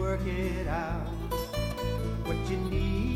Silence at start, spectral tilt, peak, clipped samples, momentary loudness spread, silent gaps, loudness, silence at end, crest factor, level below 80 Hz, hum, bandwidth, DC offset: 0 s; -6.5 dB/octave; -18 dBFS; under 0.1%; 4 LU; none; -32 LUFS; 0 s; 12 dB; -36 dBFS; none; 16 kHz; under 0.1%